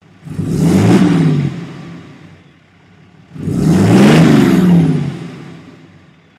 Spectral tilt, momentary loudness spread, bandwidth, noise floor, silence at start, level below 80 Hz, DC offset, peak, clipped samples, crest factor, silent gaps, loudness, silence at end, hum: -7 dB/octave; 22 LU; 14 kHz; -45 dBFS; 0.25 s; -40 dBFS; under 0.1%; 0 dBFS; 0.2%; 12 dB; none; -11 LUFS; 0.7 s; none